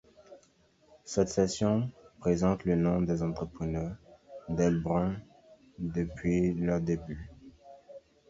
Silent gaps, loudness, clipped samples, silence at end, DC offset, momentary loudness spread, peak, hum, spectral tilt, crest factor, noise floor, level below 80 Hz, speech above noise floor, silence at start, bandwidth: none; -31 LUFS; under 0.1%; 0.3 s; under 0.1%; 19 LU; -12 dBFS; none; -7 dB/octave; 20 dB; -65 dBFS; -50 dBFS; 36 dB; 0.3 s; 8 kHz